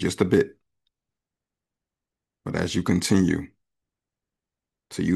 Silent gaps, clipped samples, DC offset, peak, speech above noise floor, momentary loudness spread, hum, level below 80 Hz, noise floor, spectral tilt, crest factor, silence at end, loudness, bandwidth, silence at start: none; under 0.1%; under 0.1%; -8 dBFS; 66 dB; 16 LU; none; -54 dBFS; -88 dBFS; -5.5 dB/octave; 20 dB; 0 s; -24 LUFS; 12.5 kHz; 0 s